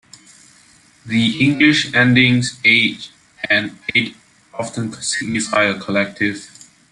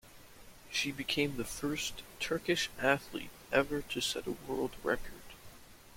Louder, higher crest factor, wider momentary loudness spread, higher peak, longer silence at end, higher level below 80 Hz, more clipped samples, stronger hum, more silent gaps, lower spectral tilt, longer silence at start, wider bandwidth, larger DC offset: first, -16 LUFS vs -35 LUFS; about the same, 18 dB vs 22 dB; first, 16 LU vs 13 LU; first, 0 dBFS vs -14 dBFS; first, 0.45 s vs 0 s; about the same, -56 dBFS vs -56 dBFS; neither; neither; neither; about the same, -4 dB/octave vs -3.5 dB/octave; first, 1.05 s vs 0.05 s; second, 11.5 kHz vs 16.5 kHz; neither